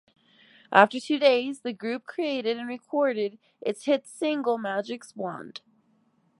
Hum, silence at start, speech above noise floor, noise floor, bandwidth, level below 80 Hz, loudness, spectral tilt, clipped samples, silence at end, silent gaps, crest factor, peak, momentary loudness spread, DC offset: none; 0.7 s; 40 dB; -67 dBFS; 11.5 kHz; -82 dBFS; -26 LUFS; -4.5 dB/octave; under 0.1%; 0.8 s; none; 26 dB; -2 dBFS; 14 LU; under 0.1%